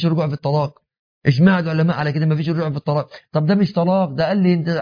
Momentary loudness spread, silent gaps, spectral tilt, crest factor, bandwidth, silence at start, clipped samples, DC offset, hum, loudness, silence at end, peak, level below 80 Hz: 7 LU; 0.99-1.22 s; -9 dB/octave; 16 dB; 5.2 kHz; 0 s; under 0.1%; under 0.1%; none; -18 LUFS; 0 s; -2 dBFS; -56 dBFS